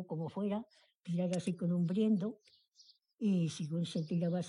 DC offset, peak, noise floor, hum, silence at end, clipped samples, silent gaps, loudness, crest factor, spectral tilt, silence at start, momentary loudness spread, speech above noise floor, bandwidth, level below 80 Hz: under 0.1%; -22 dBFS; -66 dBFS; none; 0 s; under 0.1%; 2.68-2.72 s, 3.14-3.18 s; -36 LUFS; 14 dB; -7.5 dB/octave; 0 s; 10 LU; 31 dB; 11 kHz; -80 dBFS